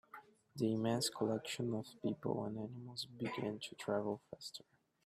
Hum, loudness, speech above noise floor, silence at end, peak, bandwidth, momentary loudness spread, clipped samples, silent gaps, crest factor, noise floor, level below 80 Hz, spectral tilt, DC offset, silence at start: none; -41 LUFS; 19 dB; 0.45 s; -24 dBFS; 15 kHz; 13 LU; under 0.1%; none; 18 dB; -60 dBFS; -78 dBFS; -5 dB/octave; under 0.1%; 0.15 s